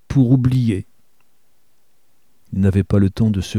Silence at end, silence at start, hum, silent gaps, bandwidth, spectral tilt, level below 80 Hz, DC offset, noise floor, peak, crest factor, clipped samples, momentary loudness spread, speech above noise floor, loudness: 0 s; 0.1 s; none; none; 11.5 kHz; -8.5 dB/octave; -40 dBFS; 0.4%; -65 dBFS; -2 dBFS; 16 dB; under 0.1%; 8 LU; 49 dB; -17 LUFS